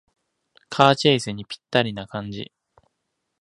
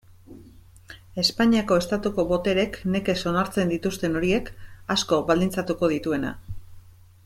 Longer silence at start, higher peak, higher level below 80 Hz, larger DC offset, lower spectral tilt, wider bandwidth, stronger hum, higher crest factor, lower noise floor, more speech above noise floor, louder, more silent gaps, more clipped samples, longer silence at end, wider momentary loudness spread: first, 0.7 s vs 0.3 s; first, 0 dBFS vs -8 dBFS; second, -60 dBFS vs -46 dBFS; neither; about the same, -5 dB/octave vs -5 dB/octave; second, 11.5 kHz vs 16.5 kHz; neither; first, 24 dB vs 18 dB; first, -77 dBFS vs -49 dBFS; first, 56 dB vs 25 dB; first, -21 LUFS vs -24 LUFS; neither; neither; first, 1 s vs 0.35 s; first, 18 LU vs 13 LU